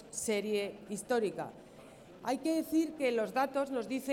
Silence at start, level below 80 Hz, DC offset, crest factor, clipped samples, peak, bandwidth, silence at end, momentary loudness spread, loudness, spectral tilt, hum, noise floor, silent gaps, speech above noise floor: 0 s; -72 dBFS; under 0.1%; 16 dB; under 0.1%; -20 dBFS; 18 kHz; 0 s; 16 LU; -34 LUFS; -4 dB/octave; none; -54 dBFS; none; 20 dB